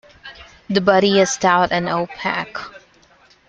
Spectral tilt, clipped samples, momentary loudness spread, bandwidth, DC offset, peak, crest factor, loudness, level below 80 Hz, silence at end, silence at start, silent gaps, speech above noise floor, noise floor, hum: -4 dB/octave; under 0.1%; 23 LU; 9.2 kHz; under 0.1%; -2 dBFS; 18 dB; -17 LUFS; -54 dBFS; 0.7 s; 0.25 s; none; 35 dB; -53 dBFS; none